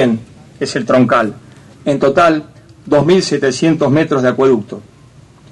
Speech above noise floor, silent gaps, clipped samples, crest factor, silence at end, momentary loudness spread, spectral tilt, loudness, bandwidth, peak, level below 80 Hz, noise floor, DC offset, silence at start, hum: 30 dB; none; under 0.1%; 12 dB; 0.7 s; 11 LU; -6 dB/octave; -13 LUFS; 11.5 kHz; -2 dBFS; -50 dBFS; -42 dBFS; under 0.1%; 0 s; none